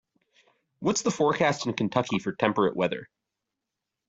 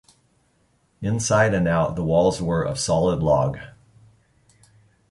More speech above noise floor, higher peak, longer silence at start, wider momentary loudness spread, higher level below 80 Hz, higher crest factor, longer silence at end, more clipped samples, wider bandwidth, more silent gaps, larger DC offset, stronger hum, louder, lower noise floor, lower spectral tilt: first, 60 dB vs 44 dB; about the same, -6 dBFS vs -6 dBFS; second, 0.8 s vs 1 s; about the same, 6 LU vs 8 LU; second, -64 dBFS vs -44 dBFS; about the same, 22 dB vs 18 dB; second, 1.05 s vs 1.4 s; neither; second, 8.2 kHz vs 11.5 kHz; neither; neither; neither; second, -26 LUFS vs -21 LUFS; first, -86 dBFS vs -64 dBFS; about the same, -4.5 dB/octave vs -5.5 dB/octave